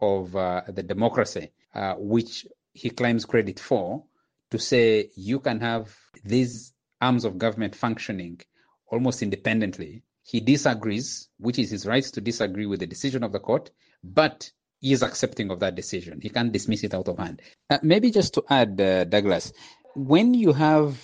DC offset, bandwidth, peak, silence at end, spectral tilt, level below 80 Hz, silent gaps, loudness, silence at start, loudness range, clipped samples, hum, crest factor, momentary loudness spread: under 0.1%; 9.8 kHz; -4 dBFS; 0.05 s; -5.5 dB/octave; -60 dBFS; none; -24 LUFS; 0 s; 5 LU; under 0.1%; none; 20 dB; 14 LU